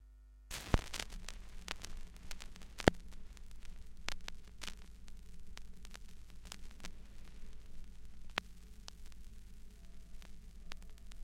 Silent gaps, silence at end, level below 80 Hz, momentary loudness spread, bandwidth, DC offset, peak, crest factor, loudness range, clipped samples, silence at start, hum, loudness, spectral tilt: none; 0 s; -48 dBFS; 21 LU; 16.5 kHz; under 0.1%; -4 dBFS; 40 dB; 13 LU; under 0.1%; 0 s; none; -44 LUFS; -4.5 dB/octave